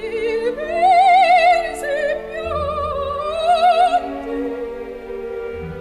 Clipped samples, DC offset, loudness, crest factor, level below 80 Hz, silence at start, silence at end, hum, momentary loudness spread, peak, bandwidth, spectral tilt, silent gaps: under 0.1%; under 0.1%; -17 LUFS; 14 dB; -42 dBFS; 0 s; 0 s; none; 17 LU; -4 dBFS; 12 kHz; -4.5 dB/octave; none